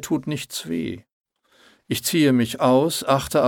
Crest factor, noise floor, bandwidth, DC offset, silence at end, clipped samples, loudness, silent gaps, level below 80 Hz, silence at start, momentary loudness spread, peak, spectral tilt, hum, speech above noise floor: 18 dB; -57 dBFS; 19 kHz; under 0.1%; 0 s; under 0.1%; -21 LUFS; 1.12-1.24 s; -54 dBFS; 0 s; 10 LU; -4 dBFS; -5 dB/octave; none; 36 dB